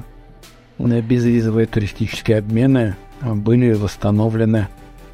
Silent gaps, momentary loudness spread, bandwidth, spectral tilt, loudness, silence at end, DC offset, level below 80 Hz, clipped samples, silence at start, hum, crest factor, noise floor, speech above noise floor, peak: none; 8 LU; 12.5 kHz; -8 dB/octave; -18 LUFS; 0 s; under 0.1%; -40 dBFS; under 0.1%; 0 s; none; 14 dB; -43 dBFS; 27 dB; -2 dBFS